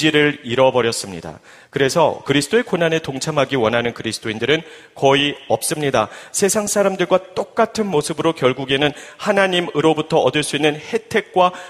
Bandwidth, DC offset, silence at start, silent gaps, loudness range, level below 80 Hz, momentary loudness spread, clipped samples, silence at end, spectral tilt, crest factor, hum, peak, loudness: 15.5 kHz; under 0.1%; 0 s; none; 1 LU; -54 dBFS; 7 LU; under 0.1%; 0 s; -4 dB/octave; 18 dB; none; 0 dBFS; -18 LUFS